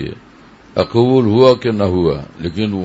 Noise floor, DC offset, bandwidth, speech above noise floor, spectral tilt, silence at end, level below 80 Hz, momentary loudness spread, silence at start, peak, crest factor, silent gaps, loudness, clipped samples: -43 dBFS; under 0.1%; 8 kHz; 29 dB; -8 dB/octave; 0 s; -42 dBFS; 13 LU; 0 s; 0 dBFS; 14 dB; none; -14 LUFS; under 0.1%